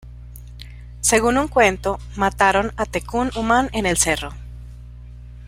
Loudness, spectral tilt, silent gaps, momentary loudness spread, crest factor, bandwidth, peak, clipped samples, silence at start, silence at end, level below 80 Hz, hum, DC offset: -19 LUFS; -3.5 dB/octave; none; 23 LU; 20 dB; 16 kHz; -2 dBFS; under 0.1%; 0.05 s; 0 s; -36 dBFS; 60 Hz at -35 dBFS; under 0.1%